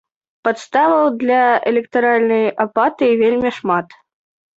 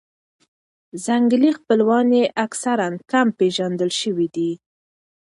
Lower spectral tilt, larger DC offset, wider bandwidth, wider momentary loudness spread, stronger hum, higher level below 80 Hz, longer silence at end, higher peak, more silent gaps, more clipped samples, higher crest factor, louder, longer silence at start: first, -6 dB/octave vs -4.5 dB/octave; neither; second, 8 kHz vs 11.5 kHz; about the same, 7 LU vs 9 LU; neither; first, -60 dBFS vs -70 dBFS; about the same, 0.75 s vs 0.65 s; about the same, -2 dBFS vs -4 dBFS; neither; neither; about the same, 14 dB vs 16 dB; first, -16 LUFS vs -19 LUFS; second, 0.45 s vs 0.95 s